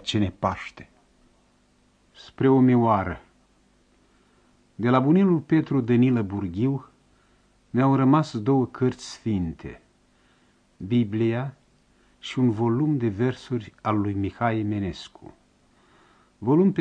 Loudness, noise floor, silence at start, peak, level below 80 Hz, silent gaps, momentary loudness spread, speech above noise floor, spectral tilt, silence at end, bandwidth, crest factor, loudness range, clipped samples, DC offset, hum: -24 LUFS; -62 dBFS; 0.05 s; -4 dBFS; -56 dBFS; none; 14 LU; 40 dB; -8 dB/octave; 0 s; 9 kHz; 20 dB; 5 LU; under 0.1%; under 0.1%; 50 Hz at -55 dBFS